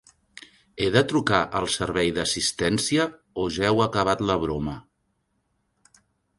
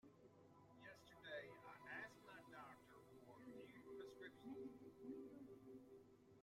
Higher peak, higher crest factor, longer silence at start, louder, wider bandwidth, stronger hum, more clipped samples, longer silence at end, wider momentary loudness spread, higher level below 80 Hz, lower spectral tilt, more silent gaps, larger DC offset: first, -4 dBFS vs -42 dBFS; about the same, 22 dB vs 18 dB; first, 0.75 s vs 0.05 s; first, -24 LUFS vs -60 LUFS; second, 11.5 kHz vs 16 kHz; neither; neither; first, 1.55 s vs 0 s; second, 8 LU vs 11 LU; first, -48 dBFS vs -88 dBFS; second, -4 dB/octave vs -5.5 dB/octave; neither; neither